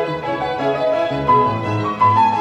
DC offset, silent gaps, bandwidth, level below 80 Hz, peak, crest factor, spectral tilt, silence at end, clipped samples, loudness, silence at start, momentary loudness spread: under 0.1%; none; 9 kHz; -48 dBFS; -2 dBFS; 14 dB; -7 dB/octave; 0 s; under 0.1%; -17 LUFS; 0 s; 8 LU